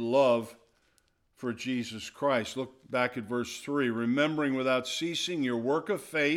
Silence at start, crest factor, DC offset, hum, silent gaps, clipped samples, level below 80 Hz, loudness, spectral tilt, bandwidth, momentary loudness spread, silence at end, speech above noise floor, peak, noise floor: 0 s; 18 dB; under 0.1%; none; none; under 0.1%; -72 dBFS; -30 LUFS; -4.5 dB/octave; 15.5 kHz; 9 LU; 0 s; 41 dB; -12 dBFS; -70 dBFS